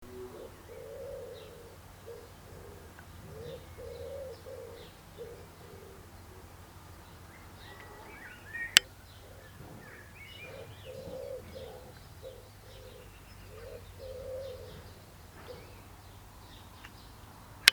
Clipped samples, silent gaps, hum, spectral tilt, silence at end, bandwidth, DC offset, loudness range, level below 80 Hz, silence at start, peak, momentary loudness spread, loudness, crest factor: under 0.1%; none; none; -1 dB/octave; 0 s; over 20 kHz; under 0.1%; 16 LU; -58 dBFS; 0 s; 0 dBFS; 9 LU; -36 LUFS; 40 dB